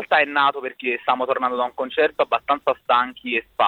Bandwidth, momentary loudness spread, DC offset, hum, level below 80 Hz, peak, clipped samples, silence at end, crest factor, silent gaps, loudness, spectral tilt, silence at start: 16 kHz; 6 LU; under 0.1%; none; -64 dBFS; -4 dBFS; under 0.1%; 0 s; 16 dB; none; -21 LUFS; -5 dB/octave; 0 s